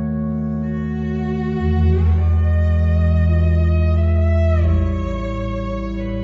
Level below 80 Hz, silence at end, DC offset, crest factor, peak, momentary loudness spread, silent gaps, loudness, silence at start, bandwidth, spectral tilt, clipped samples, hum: -22 dBFS; 0 s; under 0.1%; 12 dB; -4 dBFS; 8 LU; none; -18 LUFS; 0 s; 4.7 kHz; -10 dB/octave; under 0.1%; none